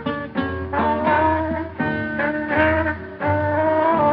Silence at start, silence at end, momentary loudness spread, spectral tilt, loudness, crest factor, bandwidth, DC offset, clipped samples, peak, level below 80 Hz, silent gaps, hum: 0 s; 0 s; 8 LU; -10 dB/octave; -21 LUFS; 16 dB; 5.4 kHz; under 0.1%; under 0.1%; -4 dBFS; -42 dBFS; none; none